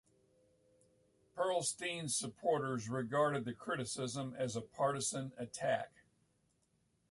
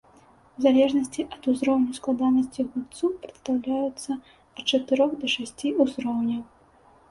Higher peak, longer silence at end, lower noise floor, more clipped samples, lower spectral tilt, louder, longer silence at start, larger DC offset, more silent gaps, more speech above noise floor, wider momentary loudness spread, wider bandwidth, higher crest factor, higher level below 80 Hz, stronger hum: second, -22 dBFS vs -8 dBFS; first, 1.25 s vs 0.65 s; first, -78 dBFS vs -56 dBFS; neither; about the same, -4 dB/octave vs -4 dB/octave; second, -38 LUFS vs -25 LUFS; first, 1.35 s vs 0.6 s; neither; neither; first, 40 dB vs 32 dB; second, 6 LU vs 10 LU; about the same, 12 kHz vs 11.5 kHz; about the same, 18 dB vs 18 dB; second, -76 dBFS vs -62 dBFS; neither